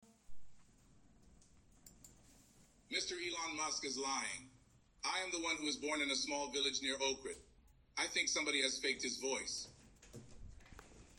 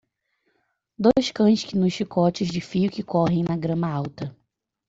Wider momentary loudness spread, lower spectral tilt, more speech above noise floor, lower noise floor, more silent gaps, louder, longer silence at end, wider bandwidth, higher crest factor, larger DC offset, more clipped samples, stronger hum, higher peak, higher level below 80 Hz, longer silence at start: first, 23 LU vs 9 LU; second, -0.5 dB/octave vs -7 dB/octave; second, 28 dB vs 50 dB; second, -68 dBFS vs -72 dBFS; neither; second, -39 LUFS vs -23 LUFS; second, 0.05 s vs 0.6 s; first, 16.5 kHz vs 7.8 kHz; about the same, 22 dB vs 18 dB; neither; neither; neither; second, -22 dBFS vs -4 dBFS; second, -68 dBFS vs -56 dBFS; second, 0.3 s vs 1 s